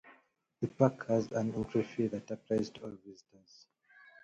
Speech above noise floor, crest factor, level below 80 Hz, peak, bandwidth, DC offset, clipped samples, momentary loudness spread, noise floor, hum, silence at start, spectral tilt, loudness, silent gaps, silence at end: 34 dB; 24 dB; -66 dBFS; -12 dBFS; 8 kHz; under 0.1%; under 0.1%; 17 LU; -69 dBFS; none; 0.05 s; -7.5 dB/octave; -34 LUFS; none; 1.1 s